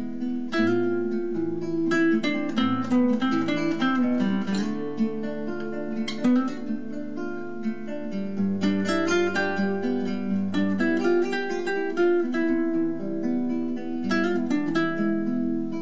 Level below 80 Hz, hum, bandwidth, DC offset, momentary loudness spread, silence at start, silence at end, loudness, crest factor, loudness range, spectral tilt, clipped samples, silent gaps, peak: -64 dBFS; none; 8 kHz; 2%; 9 LU; 0 s; 0 s; -26 LUFS; 14 dB; 4 LU; -6.5 dB/octave; under 0.1%; none; -12 dBFS